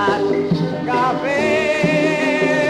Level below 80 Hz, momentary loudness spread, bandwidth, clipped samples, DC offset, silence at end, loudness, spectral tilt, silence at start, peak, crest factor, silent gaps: -50 dBFS; 3 LU; 12.5 kHz; under 0.1%; under 0.1%; 0 s; -17 LUFS; -6 dB/octave; 0 s; -6 dBFS; 12 dB; none